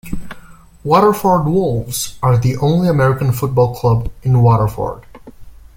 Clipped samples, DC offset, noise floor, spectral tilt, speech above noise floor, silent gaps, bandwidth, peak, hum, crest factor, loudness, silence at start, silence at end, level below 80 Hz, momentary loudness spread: under 0.1%; under 0.1%; -39 dBFS; -7 dB/octave; 25 dB; none; 17 kHz; 0 dBFS; none; 14 dB; -15 LUFS; 0.05 s; 0.25 s; -36 dBFS; 12 LU